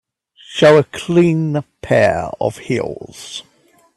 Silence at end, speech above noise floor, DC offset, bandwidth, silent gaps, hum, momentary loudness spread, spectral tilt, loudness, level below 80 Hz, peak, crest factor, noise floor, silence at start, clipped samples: 0.55 s; 29 dB; under 0.1%; 12.5 kHz; none; none; 19 LU; -6 dB/octave; -15 LUFS; -50 dBFS; 0 dBFS; 16 dB; -44 dBFS; 0.5 s; under 0.1%